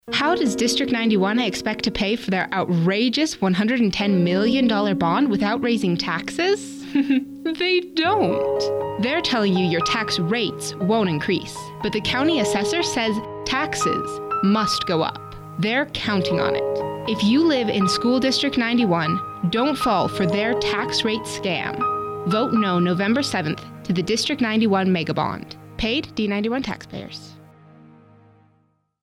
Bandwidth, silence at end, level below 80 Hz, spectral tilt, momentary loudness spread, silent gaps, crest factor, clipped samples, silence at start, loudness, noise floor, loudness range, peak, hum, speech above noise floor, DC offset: 15 kHz; 1.6 s; -50 dBFS; -5 dB/octave; 7 LU; none; 12 dB; under 0.1%; 0.05 s; -21 LUFS; -64 dBFS; 3 LU; -10 dBFS; none; 43 dB; under 0.1%